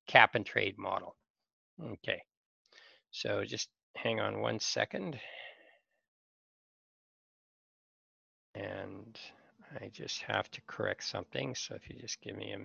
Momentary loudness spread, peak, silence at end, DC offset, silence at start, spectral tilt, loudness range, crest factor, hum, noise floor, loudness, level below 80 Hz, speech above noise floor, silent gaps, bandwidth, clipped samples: 16 LU; -6 dBFS; 0 s; under 0.1%; 0.05 s; -3 dB/octave; 13 LU; 32 dB; none; -67 dBFS; -35 LUFS; -70 dBFS; 31 dB; 1.30-1.34 s, 1.53-1.77 s, 2.37-2.65 s, 3.83-3.94 s, 6.08-8.54 s; 7.8 kHz; under 0.1%